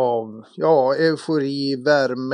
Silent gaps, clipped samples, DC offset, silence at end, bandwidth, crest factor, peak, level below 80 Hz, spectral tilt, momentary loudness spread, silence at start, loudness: none; under 0.1%; under 0.1%; 0 s; 10.5 kHz; 16 dB; -4 dBFS; -80 dBFS; -6 dB/octave; 7 LU; 0 s; -20 LUFS